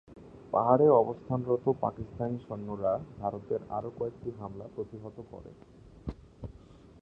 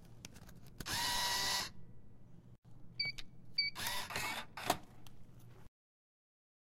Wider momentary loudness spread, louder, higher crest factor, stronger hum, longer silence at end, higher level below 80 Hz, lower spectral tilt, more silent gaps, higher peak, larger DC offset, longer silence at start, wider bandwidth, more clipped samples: second, 23 LU vs 26 LU; first, -31 LUFS vs -38 LUFS; about the same, 24 dB vs 26 dB; neither; second, 0.5 s vs 1 s; about the same, -56 dBFS vs -60 dBFS; first, -11 dB/octave vs -1 dB/octave; second, none vs 2.58-2.62 s; first, -8 dBFS vs -18 dBFS; neither; about the same, 0.1 s vs 0 s; second, 5.2 kHz vs 16 kHz; neither